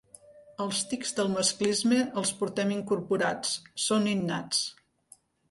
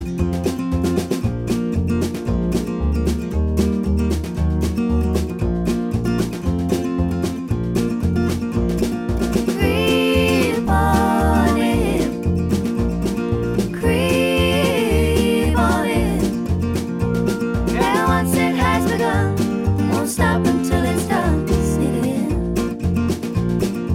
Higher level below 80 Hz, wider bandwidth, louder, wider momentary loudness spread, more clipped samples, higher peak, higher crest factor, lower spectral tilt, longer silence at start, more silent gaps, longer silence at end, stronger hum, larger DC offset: second, -70 dBFS vs -28 dBFS; second, 11.5 kHz vs 16.5 kHz; second, -28 LUFS vs -19 LUFS; about the same, 6 LU vs 5 LU; neither; second, -12 dBFS vs -2 dBFS; about the same, 18 dB vs 16 dB; second, -3.5 dB/octave vs -6 dB/octave; first, 0.3 s vs 0 s; neither; first, 0.8 s vs 0 s; neither; neither